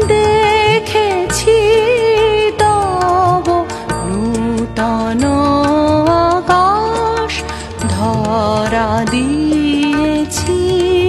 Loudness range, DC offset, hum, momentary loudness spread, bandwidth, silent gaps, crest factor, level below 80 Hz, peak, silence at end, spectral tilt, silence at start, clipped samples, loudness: 3 LU; under 0.1%; none; 6 LU; 13 kHz; none; 12 dB; -32 dBFS; 0 dBFS; 0 s; -5 dB/octave; 0 s; under 0.1%; -13 LUFS